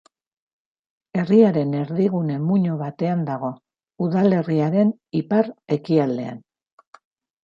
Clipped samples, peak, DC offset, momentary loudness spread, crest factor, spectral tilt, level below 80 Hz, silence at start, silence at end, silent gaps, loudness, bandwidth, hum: under 0.1%; -4 dBFS; under 0.1%; 11 LU; 18 dB; -10 dB/octave; -68 dBFS; 1.15 s; 1.05 s; none; -21 LUFS; 7 kHz; none